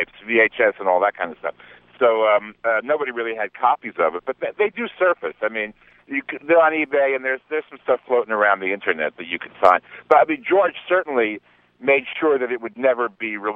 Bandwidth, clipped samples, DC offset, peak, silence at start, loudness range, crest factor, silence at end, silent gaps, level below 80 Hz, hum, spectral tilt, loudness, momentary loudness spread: 5.4 kHz; under 0.1%; under 0.1%; 0 dBFS; 0 s; 3 LU; 20 dB; 0 s; none; -66 dBFS; none; -6 dB/octave; -20 LUFS; 11 LU